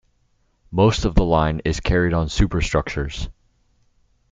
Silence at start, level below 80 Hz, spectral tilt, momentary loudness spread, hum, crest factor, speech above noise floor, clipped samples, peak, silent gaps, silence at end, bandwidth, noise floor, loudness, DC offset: 0.7 s; -28 dBFS; -6 dB/octave; 11 LU; none; 18 dB; 45 dB; under 0.1%; -2 dBFS; none; 1 s; 9.2 kHz; -64 dBFS; -20 LUFS; under 0.1%